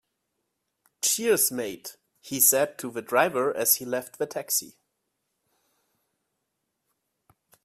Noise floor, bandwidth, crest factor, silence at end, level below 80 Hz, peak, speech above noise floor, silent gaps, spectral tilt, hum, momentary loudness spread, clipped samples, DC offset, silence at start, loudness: -80 dBFS; 16 kHz; 24 dB; 2.95 s; -74 dBFS; -6 dBFS; 54 dB; none; -1.5 dB/octave; none; 15 LU; under 0.1%; under 0.1%; 1.05 s; -24 LUFS